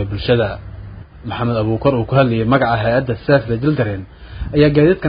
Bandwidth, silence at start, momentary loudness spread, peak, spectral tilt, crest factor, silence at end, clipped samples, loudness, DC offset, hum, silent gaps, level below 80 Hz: 5.2 kHz; 0 s; 18 LU; 0 dBFS; -12.5 dB/octave; 16 dB; 0 s; under 0.1%; -16 LUFS; under 0.1%; none; none; -34 dBFS